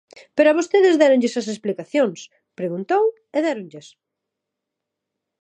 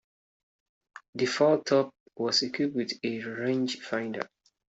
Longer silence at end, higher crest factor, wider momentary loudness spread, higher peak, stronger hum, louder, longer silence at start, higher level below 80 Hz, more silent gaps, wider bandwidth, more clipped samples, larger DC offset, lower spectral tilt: first, 1.65 s vs 0.45 s; about the same, 18 dB vs 20 dB; about the same, 14 LU vs 12 LU; first, -2 dBFS vs -10 dBFS; neither; first, -19 LUFS vs -29 LUFS; second, 0.35 s vs 1.15 s; about the same, -78 dBFS vs -76 dBFS; second, none vs 2.00-2.06 s; first, 9.6 kHz vs 8.2 kHz; neither; neither; about the same, -5 dB/octave vs -4 dB/octave